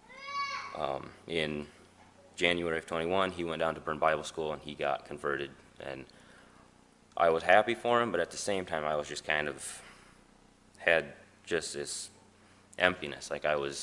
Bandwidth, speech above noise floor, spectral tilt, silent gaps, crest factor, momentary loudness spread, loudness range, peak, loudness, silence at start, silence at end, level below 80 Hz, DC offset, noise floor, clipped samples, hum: 11.5 kHz; 30 dB; -3.5 dB/octave; none; 28 dB; 15 LU; 5 LU; -6 dBFS; -32 LUFS; 0.1 s; 0 s; -64 dBFS; under 0.1%; -61 dBFS; under 0.1%; none